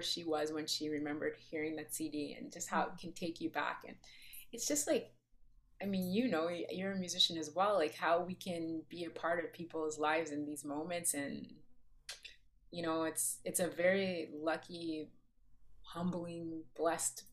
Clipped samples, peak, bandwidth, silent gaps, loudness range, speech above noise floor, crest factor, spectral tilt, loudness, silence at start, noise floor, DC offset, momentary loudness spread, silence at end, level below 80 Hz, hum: under 0.1%; -18 dBFS; 15.5 kHz; none; 5 LU; 26 dB; 20 dB; -3 dB/octave; -38 LUFS; 0 s; -64 dBFS; under 0.1%; 16 LU; 0 s; -70 dBFS; none